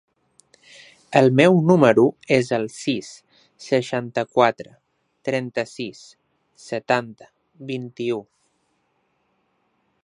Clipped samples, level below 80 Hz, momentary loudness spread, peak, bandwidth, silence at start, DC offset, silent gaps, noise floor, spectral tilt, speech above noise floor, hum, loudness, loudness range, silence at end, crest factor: under 0.1%; -66 dBFS; 19 LU; 0 dBFS; 11.5 kHz; 1.1 s; under 0.1%; none; -69 dBFS; -6.5 dB/octave; 49 dB; none; -20 LUFS; 11 LU; 1.8 s; 22 dB